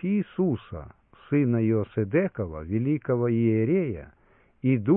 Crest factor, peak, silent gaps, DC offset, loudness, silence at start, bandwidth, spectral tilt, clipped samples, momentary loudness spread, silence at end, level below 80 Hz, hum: 14 dB; -10 dBFS; none; under 0.1%; -26 LUFS; 0 s; 3.8 kHz; -13 dB/octave; under 0.1%; 10 LU; 0 s; -54 dBFS; none